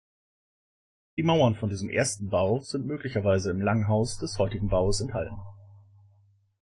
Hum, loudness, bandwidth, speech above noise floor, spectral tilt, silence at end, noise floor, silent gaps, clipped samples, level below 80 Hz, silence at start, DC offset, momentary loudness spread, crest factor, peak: none; -27 LUFS; 11 kHz; 37 dB; -5.5 dB/octave; 0.9 s; -63 dBFS; none; under 0.1%; -46 dBFS; 1.15 s; under 0.1%; 9 LU; 18 dB; -10 dBFS